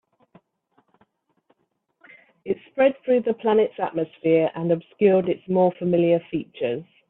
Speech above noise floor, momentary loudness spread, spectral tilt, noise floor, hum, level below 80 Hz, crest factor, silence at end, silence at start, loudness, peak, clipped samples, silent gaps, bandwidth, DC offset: 49 dB; 9 LU; -11.5 dB/octave; -71 dBFS; none; -68 dBFS; 18 dB; 0.25 s; 2.45 s; -22 LUFS; -6 dBFS; under 0.1%; none; 4 kHz; under 0.1%